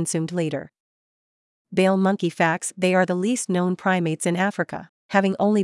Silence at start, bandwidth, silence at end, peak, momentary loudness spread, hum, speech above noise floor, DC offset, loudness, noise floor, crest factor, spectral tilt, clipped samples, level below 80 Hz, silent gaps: 0 s; 12 kHz; 0 s; -6 dBFS; 8 LU; none; over 68 dB; under 0.1%; -22 LUFS; under -90 dBFS; 16 dB; -5.5 dB/octave; under 0.1%; -74 dBFS; 0.80-1.65 s, 4.89-5.09 s